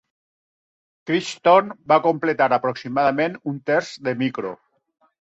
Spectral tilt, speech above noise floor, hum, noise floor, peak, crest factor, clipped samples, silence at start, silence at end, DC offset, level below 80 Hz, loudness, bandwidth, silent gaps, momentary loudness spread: -5.5 dB/octave; over 70 dB; none; under -90 dBFS; -4 dBFS; 18 dB; under 0.1%; 1.05 s; 0.65 s; under 0.1%; -66 dBFS; -21 LUFS; 8.2 kHz; none; 11 LU